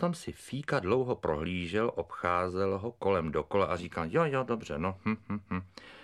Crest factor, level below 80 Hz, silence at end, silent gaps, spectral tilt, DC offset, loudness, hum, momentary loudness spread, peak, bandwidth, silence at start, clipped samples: 20 dB; -56 dBFS; 0 s; none; -6.5 dB/octave; under 0.1%; -32 LUFS; none; 8 LU; -12 dBFS; 13 kHz; 0 s; under 0.1%